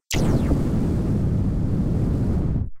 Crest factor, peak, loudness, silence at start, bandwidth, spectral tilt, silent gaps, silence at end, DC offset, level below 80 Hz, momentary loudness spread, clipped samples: 12 dB; -10 dBFS; -23 LUFS; 0.1 s; 16 kHz; -7 dB/octave; none; 0 s; under 0.1%; -28 dBFS; 2 LU; under 0.1%